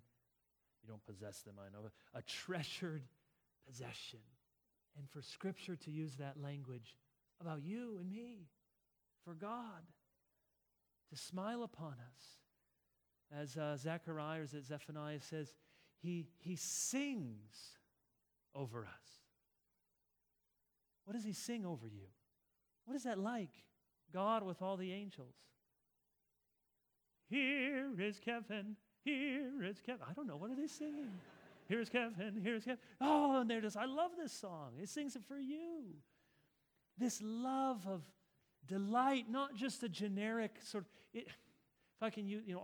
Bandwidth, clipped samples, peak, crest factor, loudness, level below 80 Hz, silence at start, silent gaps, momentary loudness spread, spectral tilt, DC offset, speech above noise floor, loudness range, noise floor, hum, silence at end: over 20 kHz; under 0.1%; -22 dBFS; 24 dB; -44 LUFS; -88 dBFS; 0.85 s; none; 18 LU; -4.5 dB/octave; under 0.1%; 42 dB; 11 LU; -86 dBFS; none; 0 s